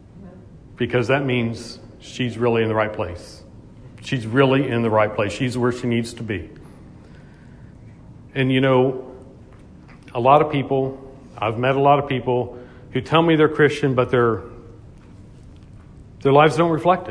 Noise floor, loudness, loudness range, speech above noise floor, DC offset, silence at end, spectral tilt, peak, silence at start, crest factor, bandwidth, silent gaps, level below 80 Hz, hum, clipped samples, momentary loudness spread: -44 dBFS; -20 LUFS; 5 LU; 25 dB; under 0.1%; 0 s; -7 dB/octave; 0 dBFS; 0.15 s; 20 dB; 11 kHz; none; -48 dBFS; none; under 0.1%; 18 LU